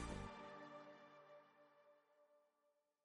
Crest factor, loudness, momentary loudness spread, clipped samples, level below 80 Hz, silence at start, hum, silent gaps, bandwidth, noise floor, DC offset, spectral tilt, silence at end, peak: 22 dB; -57 LUFS; 13 LU; under 0.1%; -66 dBFS; 0 s; none; none; 10.5 kHz; -85 dBFS; under 0.1%; -5 dB/octave; 0.35 s; -36 dBFS